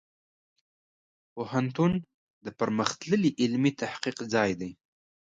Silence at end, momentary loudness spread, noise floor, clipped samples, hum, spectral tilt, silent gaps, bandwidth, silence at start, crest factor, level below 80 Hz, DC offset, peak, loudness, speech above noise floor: 0.5 s; 14 LU; under -90 dBFS; under 0.1%; none; -5.5 dB/octave; 2.14-2.41 s; 9.2 kHz; 1.35 s; 22 dB; -64 dBFS; under 0.1%; -8 dBFS; -28 LUFS; over 62 dB